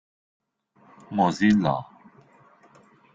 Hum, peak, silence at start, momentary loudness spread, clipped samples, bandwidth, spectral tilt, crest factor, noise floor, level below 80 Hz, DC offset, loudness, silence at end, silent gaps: none; -8 dBFS; 1.1 s; 12 LU; under 0.1%; 7.6 kHz; -6.5 dB/octave; 20 dB; -59 dBFS; -62 dBFS; under 0.1%; -23 LUFS; 1.3 s; none